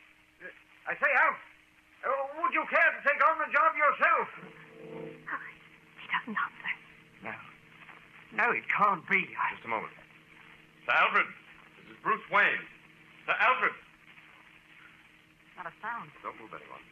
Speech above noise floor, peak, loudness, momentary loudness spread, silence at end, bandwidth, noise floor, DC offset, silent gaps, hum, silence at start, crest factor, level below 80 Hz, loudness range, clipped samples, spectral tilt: 31 dB; -12 dBFS; -28 LUFS; 22 LU; 0.1 s; 11 kHz; -60 dBFS; under 0.1%; none; none; 0.4 s; 20 dB; -76 dBFS; 11 LU; under 0.1%; -5 dB/octave